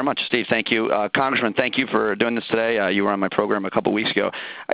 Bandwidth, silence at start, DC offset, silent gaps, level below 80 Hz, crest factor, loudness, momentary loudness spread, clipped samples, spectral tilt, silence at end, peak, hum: 4 kHz; 0 s; under 0.1%; none; -60 dBFS; 20 dB; -21 LUFS; 2 LU; under 0.1%; -8.5 dB/octave; 0 s; 0 dBFS; none